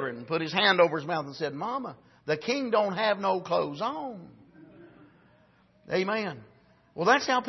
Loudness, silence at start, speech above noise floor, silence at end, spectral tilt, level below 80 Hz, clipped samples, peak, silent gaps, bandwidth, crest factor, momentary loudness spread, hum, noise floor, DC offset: -28 LUFS; 0 s; 34 dB; 0 s; -4.5 dB/octave; -72 dBFS; under 0.1%; -8 dBFS; none; 6.2 kHz; 20 dB; 16 LU; none; -62 dBFS; under 0.1%